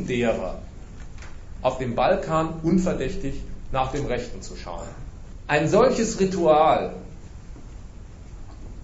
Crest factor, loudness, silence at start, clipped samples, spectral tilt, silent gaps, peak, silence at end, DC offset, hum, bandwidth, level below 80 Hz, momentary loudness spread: 18 dB; -23 LUFS; 0 s; under 0.1%; -6 dB/octave; none; -6 dBFS; 0 s; under 0.1%; none; 8 kHz; -38 dBFS; 24 LU